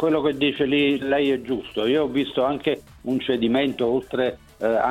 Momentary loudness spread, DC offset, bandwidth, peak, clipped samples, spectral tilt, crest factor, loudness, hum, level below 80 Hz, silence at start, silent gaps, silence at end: 6 LU; under 0.1%; 13.5 kHz; -8 dBFS; under 0.1%; -6.5 dB/octave; 14 dB; -23 LUFS; none; -52 dBFS; 0 s; none; 0 s